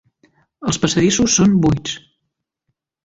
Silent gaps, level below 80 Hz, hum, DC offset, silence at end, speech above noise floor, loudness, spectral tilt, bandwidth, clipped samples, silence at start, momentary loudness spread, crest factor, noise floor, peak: none; -42 dBFS; none; under 0.1%; 1.1 s; 61 dB; -16 LUFS; -4.5 dB/octave; 8 kHz; under 0.1%; 0.6 s; 14 LU; 18 dB; -76 dBFS; 0 dBFS